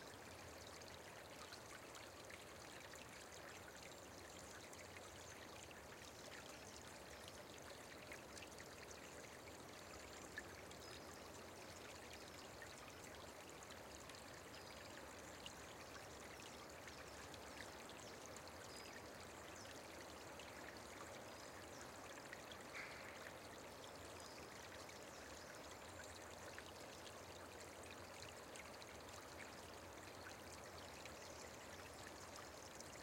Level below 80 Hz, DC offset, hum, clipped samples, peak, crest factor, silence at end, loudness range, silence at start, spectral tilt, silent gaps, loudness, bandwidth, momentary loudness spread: -74 dBFS; under 0.1%; none; under 0.1%; -38 dBFS; 20 dB; 0 s; 1 LU; 0 s; -3 dB/octave; none; -56 LUFS; 16.5 kHz; 2 LU